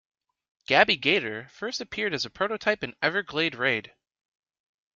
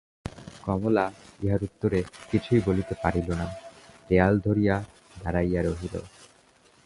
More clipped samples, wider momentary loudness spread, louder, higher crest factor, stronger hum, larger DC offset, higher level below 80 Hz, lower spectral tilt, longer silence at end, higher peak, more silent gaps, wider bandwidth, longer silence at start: neither; about the same, 13 LU vs 15 LU; about the same, -26 LUFS vs -27 LUFS; about the same, 26 dB vs 22 dB; neither; neither; second, -66 dBFS vs -42 dBFS; second, -3.5 dB/octave vs -8 dB/octave; first, 1.15 s vs 0.6 s; first, -2 dBFS vs -6 dBFS; neither; second, 7.6 kHz vs 11.5 kHz; first, 0.7 s vs 0.25 s